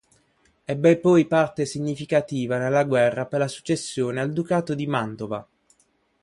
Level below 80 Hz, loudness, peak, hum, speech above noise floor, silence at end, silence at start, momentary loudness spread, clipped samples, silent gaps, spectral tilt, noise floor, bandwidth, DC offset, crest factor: -62 dBFS; -23 LUFS; -6 dBFS; none; 44 dB; 0.8 s; 0.7 s; 12 LU; under 0.1%; none; -6 dB/octave; -66 dBFS; 11.5 kHz; under 0.1%; 18 dB